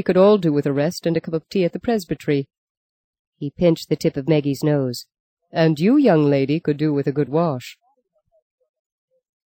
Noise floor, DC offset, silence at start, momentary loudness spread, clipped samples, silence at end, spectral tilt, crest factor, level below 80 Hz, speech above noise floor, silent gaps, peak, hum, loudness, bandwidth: -66 dBFS; under 0.1%; 0 s; 12 LU; under 0.1%; 1.7 s; -7.5 dB/octave; 16 dB; -56 dBFS; 47 dB; 2.57-3.13 s, 3.19-3.32 s, 5.20-5.37 s; -4 dBFS; none; -19 LUFS; 17 kHz